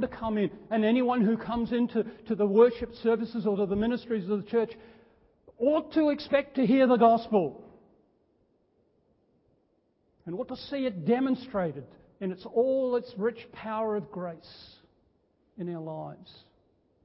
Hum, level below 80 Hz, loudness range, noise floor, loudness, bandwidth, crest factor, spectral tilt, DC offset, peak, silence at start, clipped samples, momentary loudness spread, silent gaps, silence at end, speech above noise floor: none; -60 dBFS; 11 LU; -71 dBFS; -28 LUFS; 5.8 kHz; 20 dB; -10.5 dB/octave; under 0.1%; -10 dBFS; 0 s; under 0.1%; 16 LU; none; 0.75 s; 43 dB